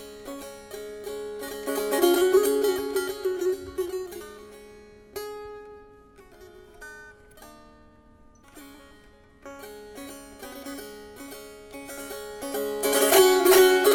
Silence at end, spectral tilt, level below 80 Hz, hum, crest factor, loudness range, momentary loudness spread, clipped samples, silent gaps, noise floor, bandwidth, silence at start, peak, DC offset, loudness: 0 s; -2 dB/octave; -58 dBFS; none; 20 dB; 22 LU; 26 LU; under 0.1%; none; -54 dBFS; 17 kHz; 0 s; -6 dBFS; under 0.1%; -23 LUFS